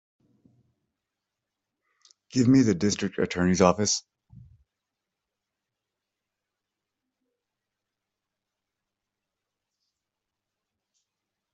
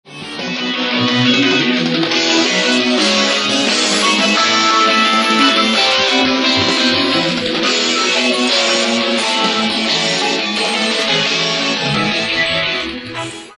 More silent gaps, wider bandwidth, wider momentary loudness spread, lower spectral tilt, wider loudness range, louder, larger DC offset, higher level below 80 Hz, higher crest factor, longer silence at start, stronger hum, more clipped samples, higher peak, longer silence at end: neither; second, 8.2 kHz vs 11.5 kHz; first, 8 LU vs 5 LU; first, -5 dB/octave vs -2.5 dB/octave; about the same, 4 LU vs 3 LU; second, -24 LUFS vs -13 LUFS; neither; second, -64 dBFS vs -54 dBFS; first, 26 dB vs 14 dB; first, 2.35 s vs 0.05 s; neither; neither; second, -6 dBFS vs 0 dBFS; first, 7.55 s vs 0.05 s